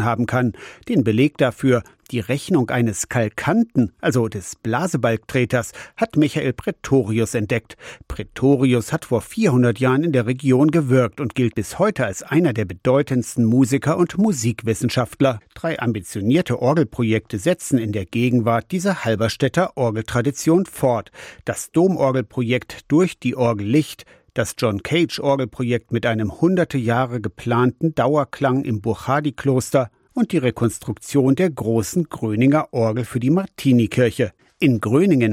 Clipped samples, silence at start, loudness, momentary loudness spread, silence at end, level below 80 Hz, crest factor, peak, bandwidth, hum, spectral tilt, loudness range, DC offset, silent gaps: under 0.1%; 0 s; -20 LUFS; 7 LU; 0 s; -50 dBFS; 14 dB; -6 dBFS; 16 kHz; none; -6.5 dB/octave; 2 LU; under 0.1%; none